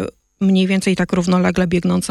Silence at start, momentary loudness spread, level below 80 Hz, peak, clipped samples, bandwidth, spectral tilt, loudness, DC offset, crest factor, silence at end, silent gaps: 0 s; 3 LU; -42 dBFS; -4 dBFS; under 0.1%; 12 kHz; -6 dB/octave; -17 LUFS; under 0.1%; 12 dB; 0 s; none